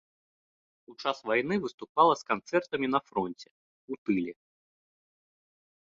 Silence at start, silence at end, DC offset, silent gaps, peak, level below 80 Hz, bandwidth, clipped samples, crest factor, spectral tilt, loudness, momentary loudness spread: 0.9 s; 1.6 s; under 0.1%; 1.74-1.78 s, 1.89-1.95 s, 3.51-3.88 s, 3.98-4.06 s; -8 dBFS; -70 dBFS; 7.8 kHz; under 0.1%; 24 dB; -5.5 dB/octave; -30 LUFS; 13 LU